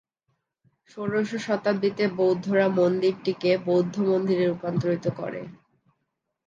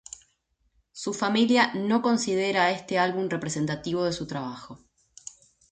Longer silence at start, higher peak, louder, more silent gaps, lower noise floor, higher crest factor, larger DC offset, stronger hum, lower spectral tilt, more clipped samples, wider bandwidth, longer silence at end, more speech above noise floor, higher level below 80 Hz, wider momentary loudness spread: about the same, 0.95 s vs 0.95 s; about the same, -8 dBFS vs -8 dBFS; about the same, -25 LUFS vs -25 LUFS; neither; first, -79 dBFS vs -71 dBFS; about the same, 16 dB vs 18 dB; neither; neither; first, -7 dB/octave vs -4.5 dB/octave; neither; second, 7.6 kHz vs 9.4 kHz; about the same, 0.95 s vs 0.95 s; first, 55 dB vs 46 dB; second, -70 dBFS vs -64 dBFS; second, 9 LU vs 22 LU